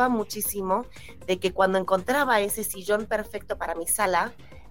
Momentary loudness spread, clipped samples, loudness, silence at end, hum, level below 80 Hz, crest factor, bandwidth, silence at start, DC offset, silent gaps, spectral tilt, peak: 9 LU; under 0.1%; -26 LUFS; 0.1 s; none; -52 dBFS; 18 dB; 17 kHz; 0 s; 0.5%; none; -3 dB/octave; -8 dBFS